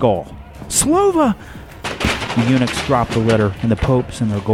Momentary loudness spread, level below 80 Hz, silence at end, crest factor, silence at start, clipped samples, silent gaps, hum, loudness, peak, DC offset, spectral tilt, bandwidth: 13 LU; -34 dBFS; 0 s; 14 dB; 0 s; under 0.1%; none; none; -17 LUFS; -2 dBFS; under 0.1%; -5 dB/octave; 16.5 kHz